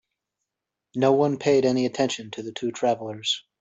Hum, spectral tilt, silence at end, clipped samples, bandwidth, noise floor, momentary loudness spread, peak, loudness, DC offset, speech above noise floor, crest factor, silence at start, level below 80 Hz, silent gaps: none; -5 dB/octave; 0.2 s; under 0.1%; 8 kHz; -85 dBFS; 11 LU; -8 dBFS; -24 LUFS; under 0.1%; 62 dB; 18 dB; 0.95 s; -68 dBFS; none